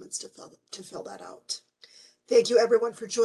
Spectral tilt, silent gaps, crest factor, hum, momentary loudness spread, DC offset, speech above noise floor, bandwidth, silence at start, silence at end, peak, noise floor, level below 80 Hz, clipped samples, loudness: -2.5 dB/octave; none; 18 dB; none; 22 LU; under 0.1%; 29 dB; 12 kHz; 0 s; 0 s; -8 dBFS; -55 dBFS; -78 dBFS; under 0.1%; -25 LUFS